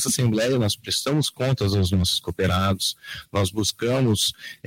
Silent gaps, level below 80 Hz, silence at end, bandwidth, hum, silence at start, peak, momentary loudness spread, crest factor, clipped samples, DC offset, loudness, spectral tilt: none; -46 dBFS; 0.1 s; 16.5 kHz; none; 0 s; -12 dBFS; 4 LU; 12 dB; under 0.1%; under 0.1%; -22 LUFS; -4.5 dB/octave